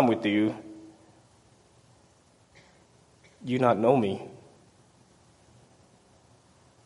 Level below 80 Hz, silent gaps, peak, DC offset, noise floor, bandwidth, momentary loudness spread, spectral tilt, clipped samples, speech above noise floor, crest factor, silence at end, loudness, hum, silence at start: -70 dBFS; none; -8 dBFS; under 0.1%; -61 dBFS; 11.5 kHz; 23 LU; -7.5 dB/octave; under 0.1%; 36 dB; 24 dB; 2.5 s; -26 LUFS; none; 0 s